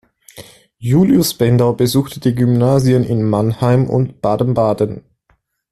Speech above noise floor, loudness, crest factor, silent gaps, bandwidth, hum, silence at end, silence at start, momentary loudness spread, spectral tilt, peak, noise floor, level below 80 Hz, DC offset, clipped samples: 47 dB; -15 LUFS; 14 dB; none; 13.5 kHz; none; 0.7 s; 0.35 s; 6 LU; -7 dB/octave; 0 dBFS; -60 dBFS; -46 dBFS; under 0.1%; under 0.1%